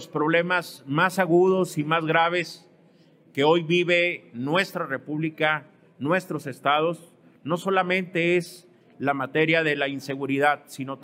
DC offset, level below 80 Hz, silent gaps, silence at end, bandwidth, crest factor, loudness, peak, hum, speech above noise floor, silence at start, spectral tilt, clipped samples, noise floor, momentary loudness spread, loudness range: under 0.1%; -80 dBFS; none; 0.05 s; 16 kHz; 20 dB; -24 LUFS; -6 dBFS; none; 33 dB; 0 s; -5.5 dB/octave; under 0.1%; -57 dBFS; 10 LU; 3 LU